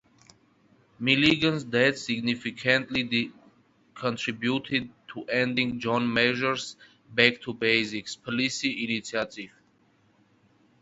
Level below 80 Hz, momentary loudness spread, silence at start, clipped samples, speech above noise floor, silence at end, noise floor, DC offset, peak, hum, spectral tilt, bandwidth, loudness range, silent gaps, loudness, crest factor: -64 dBFS; 11 LU; 1 s; under 0.1%; 38 dB; 1.35 s; -64 dBFS; under 0.1%; -4 dBFS; none; -4.5 dB/octave; 8 kHz; 4 LU; none; -26 LUFS; 26 dB